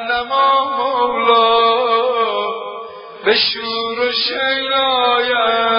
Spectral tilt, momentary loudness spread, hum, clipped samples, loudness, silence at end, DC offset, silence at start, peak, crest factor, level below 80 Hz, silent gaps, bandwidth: -7.5 dB/octave; 9 LU; none; under 0.1%; -15 LUFS; 0 s; under 0.1%; 0 s; 0 dBFS; 16 dB; -56 dBFS; none; 5.4 kHz